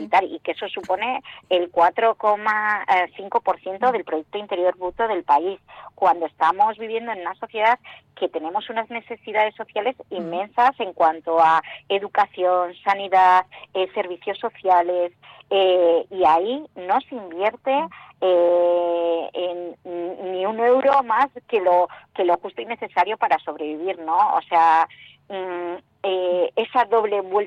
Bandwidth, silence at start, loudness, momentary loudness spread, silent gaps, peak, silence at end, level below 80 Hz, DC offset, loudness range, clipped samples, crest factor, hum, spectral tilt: 7.6 kHz; 0 s; -21 LUFS; 12 LU; none; -6 dBFS; 0 s; -66 dBFS; under 0.1%; 3 LU; under 0.1%; 14 dB; none; -5 dB/octave